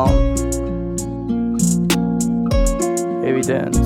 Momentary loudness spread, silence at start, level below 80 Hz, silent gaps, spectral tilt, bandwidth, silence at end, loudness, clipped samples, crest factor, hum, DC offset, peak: 6 LU; 0 s; -24 dBFS; none; -5.5 dB/octave; 18.5 kHz; 0 s; -19 LUFS; under 0.1%; 14 dB; none; under 0.1%; -2 dBFS